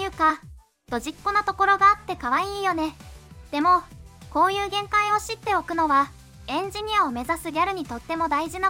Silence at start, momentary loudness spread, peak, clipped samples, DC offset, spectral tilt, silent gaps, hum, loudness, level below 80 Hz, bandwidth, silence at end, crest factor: 0 s; 11 LU; -6 dBFS; under 0.1%; under 0.1%; -3.5 dB/octave; none; none; -23 LUFS; -48 dBFS; 16.5 kHz; 0 s; 18 dB